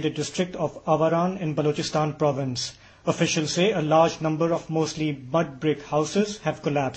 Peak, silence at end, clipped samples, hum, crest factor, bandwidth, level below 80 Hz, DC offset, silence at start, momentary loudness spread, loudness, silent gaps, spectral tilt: -6 dBFS; 0 s; under 0.1%; none; 18 dB; 8.6 kHz; -58 dBFS; under 0.1%; 0 s; 8 LU; -25 LUFS; none; -5 dB/octave